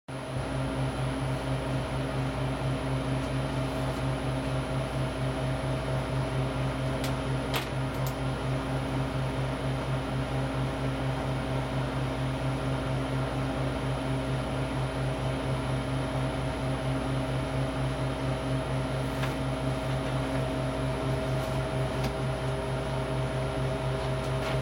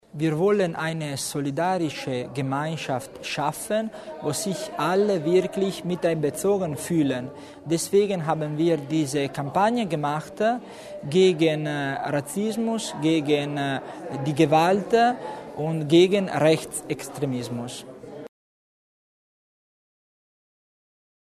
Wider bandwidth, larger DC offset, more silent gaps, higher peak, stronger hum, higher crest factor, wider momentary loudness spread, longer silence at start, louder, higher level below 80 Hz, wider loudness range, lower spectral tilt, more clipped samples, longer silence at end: first, 16 kHz vs 13.5 kHz; neither; neither; second, -12 dBFS vs -6 dBFS; neither; about the same, 18 dB vs 20 dB; second, 1 LU vs 12 LU; about the same, 0.1 s vs 0.15 s; second, -31 LUFS vs -24 LUFS; first, -40 dBFS vs -64 dBFS; second, 0 LU vs 6 LU; about the same, -6.5 dB/octave vs -5.5 dB/octave; neither; second, 0 s vs 2.95 s